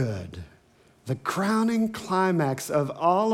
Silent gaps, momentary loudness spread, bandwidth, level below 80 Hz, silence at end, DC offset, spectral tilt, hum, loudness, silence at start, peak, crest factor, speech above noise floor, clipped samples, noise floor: none; 15 LU; 16 kHz; -64 dBFS; 0 s; under 0.1%; -6 dB/octave; none; -26 LUFS; 0 s; -8 dBFS; 16 dB; 34 dB; under 0.1%; -59 dBFS